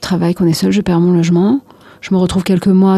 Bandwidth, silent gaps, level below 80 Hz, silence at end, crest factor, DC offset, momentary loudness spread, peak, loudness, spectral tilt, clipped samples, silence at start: 13.5 kHz; none; -40 dBFS; 0 s; 10 dB; under 0.1%; 5 LU; -2 dBFS; -13 LUFS; -7 dB/octave; under 0.1%; 0 s